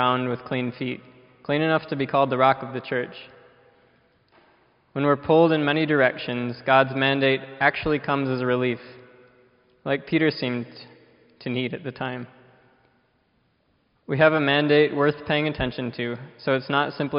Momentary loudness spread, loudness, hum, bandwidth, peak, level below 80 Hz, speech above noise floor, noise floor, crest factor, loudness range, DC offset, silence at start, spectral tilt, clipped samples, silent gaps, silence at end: 13 LU; -23 LUFS; none; 5.4 kHz; -4 dBFS; -56 dBFS; 44 dB; -67 dBFS; 20 dB; 7 LU; under 0.1%; 0 s; -4 dB/octave; under 0.1%; none; 0 s